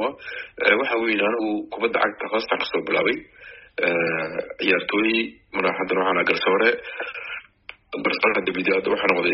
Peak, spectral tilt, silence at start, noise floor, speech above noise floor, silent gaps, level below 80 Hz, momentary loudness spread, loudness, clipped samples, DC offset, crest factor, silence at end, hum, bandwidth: -2 dBFS; -1.5 dB/octave; 0 s; -46 dBFS; 23 dB; none; -62 dBFS; 12 LU; -22 LUFS; under 0.1%; under 0.1%; 20 dB; 0 s; none; 5.8 kHz